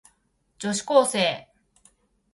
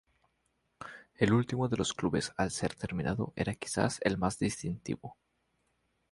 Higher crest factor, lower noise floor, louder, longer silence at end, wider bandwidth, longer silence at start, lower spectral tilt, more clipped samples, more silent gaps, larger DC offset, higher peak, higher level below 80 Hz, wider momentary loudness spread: about the same, 22 dB vs 22 dB; second, -69 dBFS vs -77 dBFS; first, -23 LUFS vs -33 LUFS; about the same, 0.9 s vs 1 s; about the same, 11.5 kHz vs 11.5 kHz; second, 0.6 s vs 0.8 s; second, -3 dB/octave vs -5 dB/octave; neither; neither; neither; first, -4 dBFS vs -12 dBFS; second, -68 dBFS vs -56 dBFS; about the same, 14 LU vs 16 LU